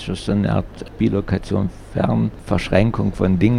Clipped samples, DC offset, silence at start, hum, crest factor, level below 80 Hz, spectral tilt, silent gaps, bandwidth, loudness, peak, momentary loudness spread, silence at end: under 0.1%; under 0.1%; 0 s; none; 18 dB; -34 dBFS; -8 dB/octave; none; 11 kHz; -20 LUFS; -2 dBFS; 6 LU; 0 s